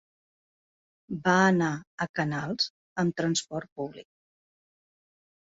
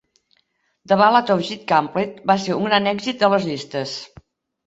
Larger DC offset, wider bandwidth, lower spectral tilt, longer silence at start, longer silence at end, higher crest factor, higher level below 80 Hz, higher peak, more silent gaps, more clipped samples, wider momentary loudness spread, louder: neither; about the same, 8 kHz vs 8 kHz; about the same, -4.5 dB/octave vs -5 dB/octave; first, 1.1 s vs 0.9 s; first, 1.4 s vs 0.6 s; about the same, 22 dB vs 18 dB; about the same, -66 dBFS vs -62 dBFS; second, -8 dBFS vs -2 dBFS; first, 1.87-1.98 s, 2.09-2.14 s, 2.70-2.96 s, 3.72-3.76 s vs none; neither; first, 16 LU vs 12 LU; second, -28 LUFS vs -19 LUFS